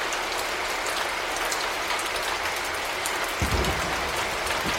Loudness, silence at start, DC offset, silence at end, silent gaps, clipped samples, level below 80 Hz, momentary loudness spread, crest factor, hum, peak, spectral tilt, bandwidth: -26 LUFS; 0 s; under 0.1%; 0 s; none; under 0.1%; -40 dBFS; 2 LU; 20 dB; none; -8 dBFS; -2.5 dB/octave; 16.5 kHz